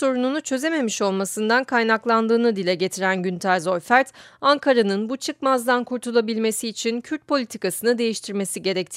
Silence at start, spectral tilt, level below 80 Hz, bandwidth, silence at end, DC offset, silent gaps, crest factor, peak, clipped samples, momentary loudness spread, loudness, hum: 0 s; -4 dB/octave; -72 dBFS; 16 kHz; 0 s; under 0.1%; none; 18 dB; -2 dBFS; under 0.1%; 6 LU; -22 LUFS; none